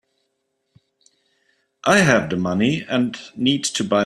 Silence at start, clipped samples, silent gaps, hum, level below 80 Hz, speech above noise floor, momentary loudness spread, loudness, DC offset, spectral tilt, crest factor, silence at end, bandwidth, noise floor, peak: 1.85 s; under 0.1%; none; none; -56 dBFS; 54 dB; 8 LU; -19 LUFS; under 0.1%; -4.5 dB/octave; 20 dB; 0 s; 12.5 kHz; -73 dBFS; -2 dBFS